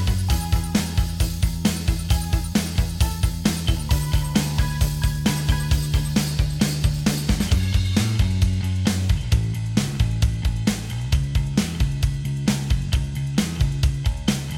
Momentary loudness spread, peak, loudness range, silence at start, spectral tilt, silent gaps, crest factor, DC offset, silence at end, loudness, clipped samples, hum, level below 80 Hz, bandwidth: 3 LU; -4 dBFS; 2 LU; 0 s; -5 dB/octave; none; 18 dB; under 0.1%; 0 s; -23 LUFS; under 0.1%; none; -26 dBFS; 17.5 kHz